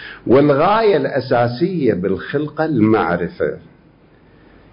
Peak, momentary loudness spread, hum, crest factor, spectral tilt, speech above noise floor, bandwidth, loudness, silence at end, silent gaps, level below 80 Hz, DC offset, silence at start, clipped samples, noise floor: -2 dBFS; 9 LU; none; 14 dB; -12 dB/octave; 33 dB; 5.4 kHz; -16 LUFS; 1.15 s; none; -48 dBFS; under 0.1%; 0 s; under 0.1%; -49 dBFS